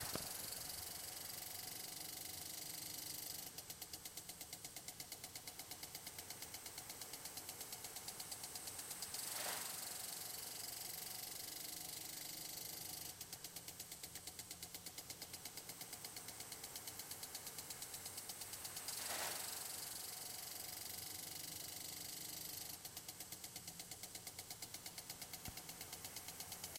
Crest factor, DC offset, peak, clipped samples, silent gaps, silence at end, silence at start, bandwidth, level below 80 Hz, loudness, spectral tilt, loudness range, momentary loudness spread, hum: 26 dB; under 0.1%; -24 dBFS; under 0.1%; none; 0 s; 0 s; 17 kHz; -76 dBFS; -48 LUFS; -0.5 dB/octave; 4 LU; 6 LU; none